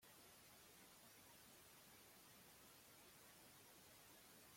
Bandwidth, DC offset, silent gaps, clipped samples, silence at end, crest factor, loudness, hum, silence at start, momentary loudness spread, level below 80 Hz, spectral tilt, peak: 16.5 kHz; under 0.1%; none; under 0.1%; 0 s; 14 dB; -65 LUFS; none; 0 s; 0 LU; -88 dBFS; -2 dB/octave; -54 dBFS